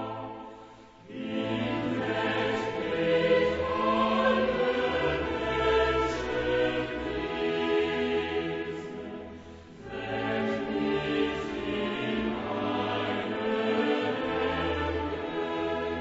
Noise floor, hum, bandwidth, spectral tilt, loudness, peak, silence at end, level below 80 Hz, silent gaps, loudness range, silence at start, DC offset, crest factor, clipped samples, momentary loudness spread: -50 dBFS; none; 8 kHz; -6 dB/octave; -29 LUFS; -12 dBFS; 0 s; -48 dBFS; none; 5 LU; 0 s; under 0.1%; 16 dB; under 0.1%; 13 LU